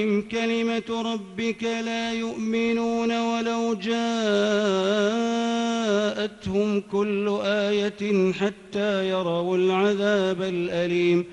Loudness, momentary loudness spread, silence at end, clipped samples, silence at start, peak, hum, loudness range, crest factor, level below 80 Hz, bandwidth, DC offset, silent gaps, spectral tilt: -24 LUFS; 6 LU; 0 s; under 0.1%; 0 s; -10 dBFS; none; 2 LU; 14 dB; -62 dBFS; 9.8 kHz; under 0.1%; none; -5.5 dB/octave